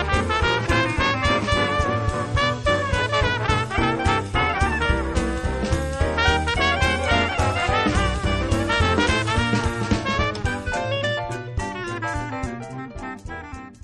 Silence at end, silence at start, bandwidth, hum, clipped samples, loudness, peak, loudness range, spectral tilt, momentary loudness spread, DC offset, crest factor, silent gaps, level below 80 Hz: 0.1 s; 0 s; 11.5 kHz; none; under 0.1%; -22 LUFS; -6 dBFS; 5 LU; -5 dB/octave; 9 LU; under 0.1%; 16 dB; none; -30 dBFS